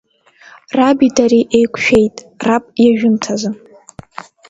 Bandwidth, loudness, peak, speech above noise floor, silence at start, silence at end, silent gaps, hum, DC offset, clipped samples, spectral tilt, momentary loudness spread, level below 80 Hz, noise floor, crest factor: 8 kHz; -13 LUFS; 0 dBFS; 32 dB; 0.75 s; 0.95 s; none; none; under 0.1%; under 0.1%; -5 dB/octave; 17 LU; -46 dBFS; -45 dBFS; 14 dB